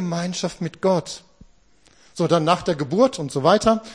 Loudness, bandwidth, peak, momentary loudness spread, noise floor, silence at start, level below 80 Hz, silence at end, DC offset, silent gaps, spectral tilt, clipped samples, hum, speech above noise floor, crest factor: -21 LUFS; 10.5 kHz; -2 dBFS; 11 LU; -57 dBFS; 0 s; -52 dBFS; 0 s; 0.1%; none; -5.5 dB/octave; under 0.1%; none; 37 dB; 18 dB